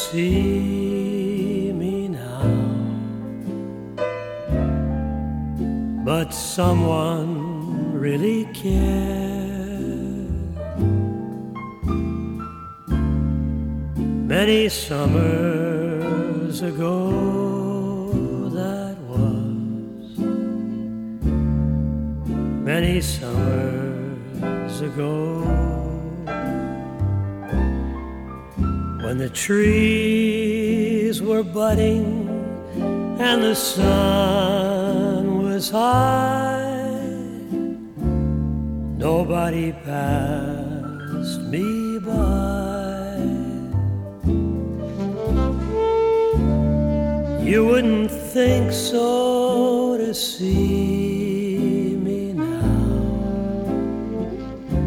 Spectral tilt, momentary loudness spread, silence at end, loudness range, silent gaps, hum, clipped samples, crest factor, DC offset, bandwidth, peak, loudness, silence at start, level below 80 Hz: -6.5 dB/octave; 10 LU; 0 s; 6 LU; none; none; under 0.1%; 18 dB; under 0.1%; 17.5 kHz; -4 dBFS; -22 LUFS; 0 s; -32 dBFS